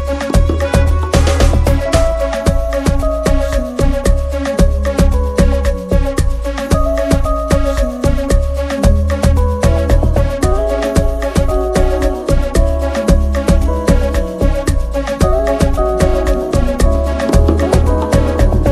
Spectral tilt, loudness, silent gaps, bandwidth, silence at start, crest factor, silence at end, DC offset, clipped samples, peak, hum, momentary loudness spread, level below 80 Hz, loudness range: -6.5 dB/octave; -14 LUFS; none; 14 kHz; 0 s; 12 dB; 0 s; under 0.1%; 0.1%; 0 dBFS; none; 4 LU; -14 dBFS; 1 LU